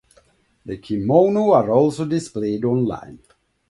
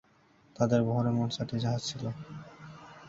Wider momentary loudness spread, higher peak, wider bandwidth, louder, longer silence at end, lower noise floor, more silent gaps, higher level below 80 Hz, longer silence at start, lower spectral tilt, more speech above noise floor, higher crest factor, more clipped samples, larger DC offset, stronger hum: second, 15 LU vs 21 LU; first, -2 dBFS vs -12 dBFS; first, 11.5 kHz vs 7.8 kHz; first, -19 LUFS vs -31 LUFS; first, 0.55 s vs 0 s; second, -58 dBFS vs -63 dBFS; neither; first, -54 dBFS vs -62 dBFS; about the same, 0.65 s vs 0.6 s; first, -8 dB/octave vs -6.5 dB/octave; first, 39 dB vs 33 dB; about the same, 18 dB vs 20 dB; neither; neither; neither